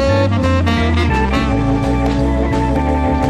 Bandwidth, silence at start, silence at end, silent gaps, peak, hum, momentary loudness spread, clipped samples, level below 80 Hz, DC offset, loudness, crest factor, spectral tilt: 10.5 kHz; 0 s; 0 s; none; -2 dBFS; none; 2 LU; under 0.1%; -20 dBFS; under 0.1%; -15 LUFS; 12 dB; -7 dB/octave